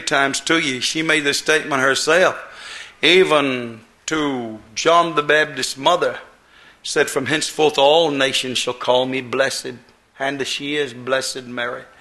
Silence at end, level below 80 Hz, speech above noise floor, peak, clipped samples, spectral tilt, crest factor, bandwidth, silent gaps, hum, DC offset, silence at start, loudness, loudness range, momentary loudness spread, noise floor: 0.15 s; -58 dBFS; 30 dB; 0 dBFS; under 0.1%; -2.5 dB/octave; 18 dB; 12.5 kHz; none; none; under 0.1%; 0 s; -18 LUFS; 4 LU; 13 LU; -49 dBFS